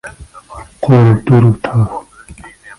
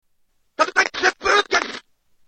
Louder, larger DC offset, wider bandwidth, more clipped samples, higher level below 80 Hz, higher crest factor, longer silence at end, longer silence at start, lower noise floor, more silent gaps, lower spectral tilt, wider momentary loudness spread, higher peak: first, -11 LUFS vs -19 LUFS; neither; first, 11.5 kHz vs 8.8 kHz; neither; first, -38 dBFS vs -56 dBFS; second, 12 dB vs 22 dB; second, 0.3 s vs 0.5 s; second, 0.05 s vs 0.6 s; second, -36 dBFS vs -63 dBFS; neither; first, -9 dB/octave vs -0.5 dB/octave; first, 23 LU vs 17 LU; about the same, 0 dBFS vs 0 dBFS